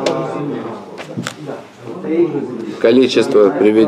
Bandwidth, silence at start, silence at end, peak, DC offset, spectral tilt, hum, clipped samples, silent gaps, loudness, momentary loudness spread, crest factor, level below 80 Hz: 11.5 kHz; 0 s; 0 s; 0 dBFS; under 0.1%; -6 dB/octave; none; under 0.1%; none; -15 LUFS; 18 LU; 14 dB; -62 dBFS